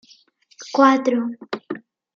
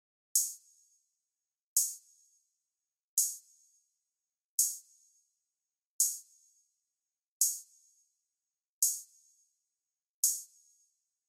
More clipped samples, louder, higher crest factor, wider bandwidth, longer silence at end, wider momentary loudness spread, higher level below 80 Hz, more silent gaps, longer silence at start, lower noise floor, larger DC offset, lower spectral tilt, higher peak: neither; first, -19 LUFS vs -31 LUFS; second, 18 dB vs 26 dB; second, 7.4 kHz vs 16.5 kHz; second, 0.4 s vs 0.85 s; first, 19 LU vs 15 LU; first, -76 dBFS vs under -90 dBFS; second, none vs 1.63-1.76 s, 3.04-3.17 s, 4.45-4.58 s, 5.86-5.99 s, 7.28-7.40 s, 8.69-8.82 s, 10.10-10.23 s; first, 0.6 s vs 0.35 s; second, -54 dBFS vs under -90 dBFS; neither; first, -4.5 dB/octave vs 8 dB/octave; first, -2 dBFS vs -14 dBFS